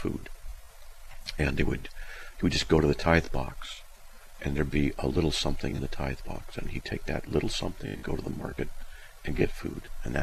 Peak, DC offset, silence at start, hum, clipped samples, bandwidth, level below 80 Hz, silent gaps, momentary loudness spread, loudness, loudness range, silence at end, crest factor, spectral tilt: -8 dBFS; under 0.1%; 0 s; none; under 0.1%; 14.5 kHz; -38 dBFS; none; 19 LU; -31 LUFS; 6 LU; 0 s; 22 dB; -5.5 dB/octave